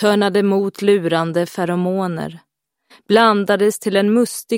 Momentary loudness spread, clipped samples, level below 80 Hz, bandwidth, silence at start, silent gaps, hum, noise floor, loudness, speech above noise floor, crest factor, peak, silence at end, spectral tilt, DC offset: 7 LU; under 0.1%; -66 dBFS; 16.5 kHz; 0 s; none; none; -53 dBFS; -17 LUFS; 37 dB; 16 dB; 0 dBFS; 0 s; -5.5 dB/octave; under 0.1%